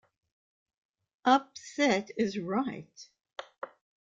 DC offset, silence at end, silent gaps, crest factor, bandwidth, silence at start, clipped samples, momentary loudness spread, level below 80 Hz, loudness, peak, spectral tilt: under 0.1%; 0.4 s; none; 24 dB; 7.8 kHz; 1.25 s; under 0.1%; 20 LU; -74 dBFS; -29 LUFS; -10 dBFS; -4.5 dB/octave